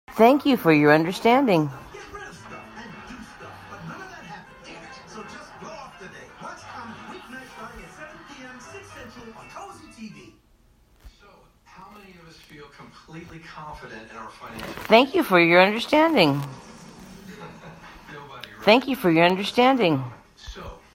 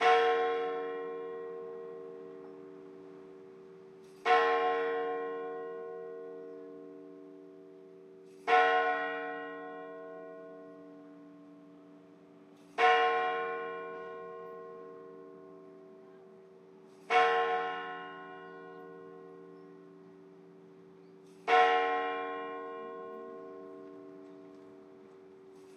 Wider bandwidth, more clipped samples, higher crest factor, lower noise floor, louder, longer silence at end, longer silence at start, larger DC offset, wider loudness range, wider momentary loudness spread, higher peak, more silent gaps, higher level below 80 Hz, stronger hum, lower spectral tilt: first, 16 kHz vs 9.2 kHz; neither; about the same, 24 dB vs 24 dB; about the same, -58 dBFS vs -57 dBFS; first, -19 LUFS vs -32 LUFS; first, 0.2 s vs 0 s; about the same, 0.1 s vs 0 s; neither; first, 23 LU vs 14 LU; about the same, 25 LU vs 27 LU; first, 0 dBFS vs -12 dBFS; neither; first, -56 dBFS vs under -90 dBFS; neither; first, -5.5 dB/octave vs -3.5 dB/octave